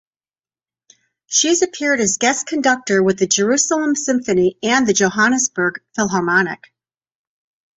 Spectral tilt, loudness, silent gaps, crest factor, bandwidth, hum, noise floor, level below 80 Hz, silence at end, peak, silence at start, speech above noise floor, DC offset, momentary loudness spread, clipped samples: -2.5 dB/octave; -16 LUFS; none; 16 dB; 8.4 kHz; none; under -90 dBFS; -58 dBFS; 1.2 s; -2 dBFS; 1.3 s; over 73 dB; under 0.1%; 5 LU; under 0.1%